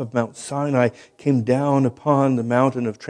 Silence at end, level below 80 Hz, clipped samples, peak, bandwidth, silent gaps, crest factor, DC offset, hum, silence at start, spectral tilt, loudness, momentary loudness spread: 0 s; -64 dBFS; under 0.1%; -2 dBFS; 10 kHz; none; 18 dB; under 0.1%; none; 0 s; -7.5 dB/octave; -20 LUFS; 7 LU